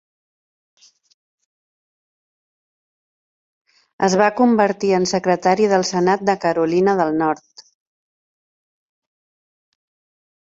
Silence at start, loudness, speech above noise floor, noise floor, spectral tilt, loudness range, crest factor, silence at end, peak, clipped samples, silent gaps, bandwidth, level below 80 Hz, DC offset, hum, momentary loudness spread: 4 s; -17 LUFS; over 73 dB; under -90 dBFS; -5 dB/octave; 9 LU; 20 dB; 3.05 s; -2 dBFS; under 0.1%; none; 8 kHz; -62 dBFS; under 0.1%; none; 4 LU